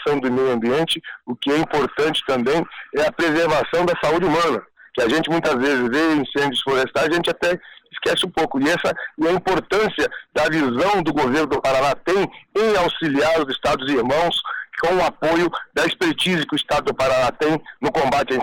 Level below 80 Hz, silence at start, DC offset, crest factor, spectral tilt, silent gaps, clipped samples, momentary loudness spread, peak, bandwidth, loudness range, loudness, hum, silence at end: -48 dBFS; 0 s; under 0.1%; 6 dB; -4.5 dB/octave; none; under 0.1%; 5 LU; -14 dBFS; 16.5 kHz; 1 LU; -20 LUFS; none; 0 s